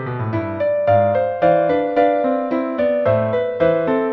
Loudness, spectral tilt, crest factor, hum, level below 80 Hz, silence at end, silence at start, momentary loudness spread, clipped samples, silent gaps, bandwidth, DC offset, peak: -18 LUFS; -9.5 dB/octave; 14 dB; none; -52 dBFS; 0 s; 0 s; 5 LU; under 0.1%; none; 5 kHz; under 0.1%; -4 dBFS